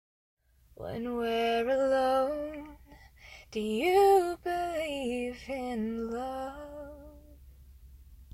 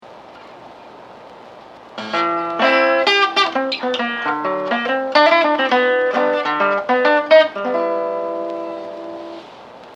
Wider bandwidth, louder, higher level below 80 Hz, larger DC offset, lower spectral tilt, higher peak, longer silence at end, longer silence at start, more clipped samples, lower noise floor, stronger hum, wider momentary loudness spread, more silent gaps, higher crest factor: first, 16 kHz vs 9.6 kHz; second, -30 LUFS vs -16 LUFS; first, -56 dBFS vs -68 dBFS; neither; first, -5 dB/octave vs -3.5 dB/octave; second, -14 dBFS vs 0 dBFS; about the same, 0.1 s vs 0 s; first, 0.8 s vs 0.05 s; neither; first, -55 dBFS vs -40 dBFS; neither; first, 21 LU vs 17 LU; neither; about the same, 18 dB vs 18 dB